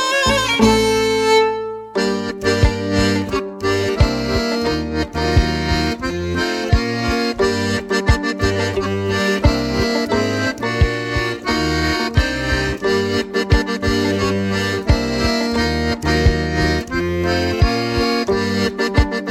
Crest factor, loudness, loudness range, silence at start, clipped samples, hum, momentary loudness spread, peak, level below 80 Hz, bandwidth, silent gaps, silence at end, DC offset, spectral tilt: 16 dB; -18 LUFS; 1 LU; 0 s; under 0.1%; none; 5 LU; 0 dBFS; -26 dBFS; 15.5 kHz; none; 0 s; under 0.1%; -5 dB/octave